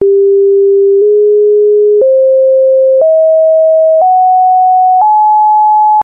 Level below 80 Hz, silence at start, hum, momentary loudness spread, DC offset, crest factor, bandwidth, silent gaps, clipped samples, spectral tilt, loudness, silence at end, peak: -66 dBFS; 0 s; none; 0 LU; under 0.1%; 4 dB; 1.3 kHz; none; under 0.1%; -3 dB/octave; -7 LUFS; 0 s; -2 dBFS